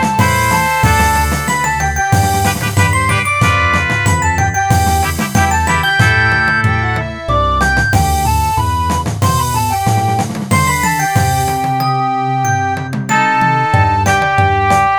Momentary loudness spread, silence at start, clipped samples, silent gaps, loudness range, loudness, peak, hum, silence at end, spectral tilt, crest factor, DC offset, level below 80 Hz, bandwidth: 4 LU; 0 s; under 0.1%; none; 2 LU; -13 LUFS; 0 dBFS; none; 0 s; -4.5 dB/octave; 12 dB; 0.2%; -26 dBFS; over 20 kHz